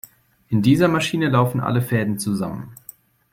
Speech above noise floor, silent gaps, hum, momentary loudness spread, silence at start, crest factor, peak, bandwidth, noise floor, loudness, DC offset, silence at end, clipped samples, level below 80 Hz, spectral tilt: 27 dB; none; none; 15 LU; 0.5 s; 18 dB; -4 dBFS; 16.5 kHz; -46 dBFS; -20 LUFS; under 0.1%; 0.6 s; under 0.1%; -54 dBFS; -6 dB/octave